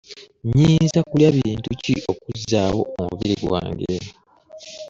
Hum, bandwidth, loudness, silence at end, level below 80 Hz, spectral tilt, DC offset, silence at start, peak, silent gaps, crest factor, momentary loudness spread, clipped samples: none; 7.6 kHz; -20 LUFS; 0 s; -44 dBFS; -6.5 dB/octave; under 0.1%; 0.1 s; -4 dBFS; none; 18 dB; 14 LU; under 0.1%